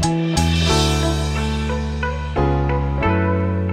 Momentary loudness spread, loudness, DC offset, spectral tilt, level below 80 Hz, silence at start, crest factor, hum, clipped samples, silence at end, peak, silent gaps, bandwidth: 6 LU; -19 LUFS; under 0.1%; -5.5 dB/octave; -26 dBFS; 0 s; 14 dB; none; under 0.1%; 0 s; -4 dBFS; none; 15 kHz